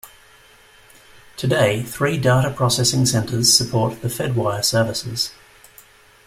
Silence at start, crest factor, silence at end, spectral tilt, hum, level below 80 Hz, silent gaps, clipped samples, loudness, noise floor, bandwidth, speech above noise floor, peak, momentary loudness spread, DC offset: 0.05 s; 20 dB; 0.95 s; -4 dB/octave; none; -50 dBFS; none; under 0.1%; -18 LUFS; -49 dBFS; 16 kHz; 31 dB; 0 dBFS; 10 LU; under 0.1%